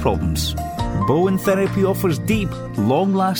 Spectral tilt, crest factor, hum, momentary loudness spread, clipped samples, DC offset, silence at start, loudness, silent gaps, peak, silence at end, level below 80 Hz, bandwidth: -6 dB/octave; 14 dB; none; 6 LU; under 0.1%; under 0.1%; 0 s; -19 LUFS; none; -4 dBFS; 0 s; -32 dBFS; 19.5 kHz